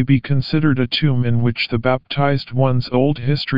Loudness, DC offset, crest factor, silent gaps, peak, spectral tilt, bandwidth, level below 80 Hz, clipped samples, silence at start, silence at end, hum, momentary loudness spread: -18 LUFS; 3%; 16 dB; none; -2 dBFS; -9 dB/octave; 5.4 kHz; -44 dBFS; under 0.1%; 0 s; 0 s; none; 2 LU